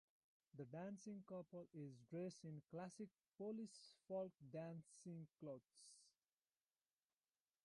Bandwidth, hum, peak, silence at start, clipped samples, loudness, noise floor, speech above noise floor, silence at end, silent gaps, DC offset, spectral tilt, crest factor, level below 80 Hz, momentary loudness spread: 11 kHz; none; -40 dBFS; 0.55 s; under 0.1%; -56 LUFS; under -90 dBFS; over 35 dB; 1.55 s; 3.28-3.32 s; under 0.1%; -6.5 dB/octave; 16 dB; under -90 dBFS; 8 LU